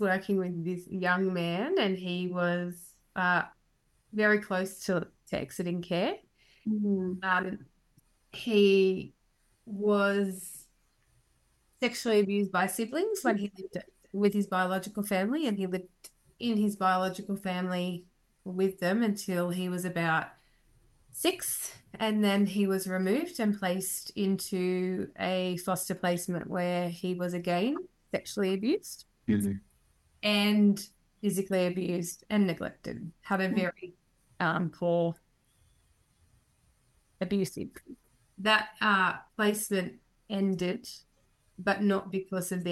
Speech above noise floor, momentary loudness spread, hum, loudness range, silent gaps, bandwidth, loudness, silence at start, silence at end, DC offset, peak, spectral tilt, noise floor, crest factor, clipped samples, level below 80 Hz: 41 dB; 14 LU; none; 3 LU; none; 14 kHz; -30 LUFS; 0 s; 0 s; under 0.1%; -10 dBFS; -5 dB/octave; -71 dBFS; 20 dB; under 0.1%; -68 dBFS